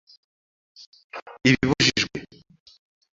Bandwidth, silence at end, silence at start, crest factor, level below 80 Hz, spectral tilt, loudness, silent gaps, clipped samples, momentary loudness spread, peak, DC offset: 7.8 kHz; 0.9 s; 1.15 s; 24 dB; -50 dBFS; -4 dB/octave; -21 LUFS; 1.22-1.26 s; under 0.1%; 21 LU; -4 dBFS; under 0.1%